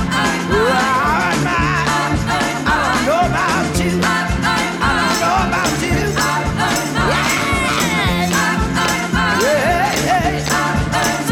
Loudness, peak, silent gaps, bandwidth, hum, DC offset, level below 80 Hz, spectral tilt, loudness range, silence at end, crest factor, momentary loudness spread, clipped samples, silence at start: -16 LUFS; -6 dBFS; none; over 20 kHz; none; under 0.1%; -30 dBFS; -4 dB/octave; 1 LU; 0 s; 10 dB; 2 LU; under 0.1%; 0 s